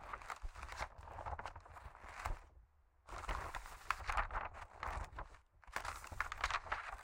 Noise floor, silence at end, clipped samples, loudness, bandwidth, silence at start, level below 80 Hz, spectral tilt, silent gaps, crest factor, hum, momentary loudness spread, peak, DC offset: -68 dBFS; 0 s; under 0.1%; -46 LUFS; 16.5 kHz; 0 s; -52 dBFS; -3 dB/octave; none; 28 dB; none; 14 LU; -18 dBFS; under 0.1%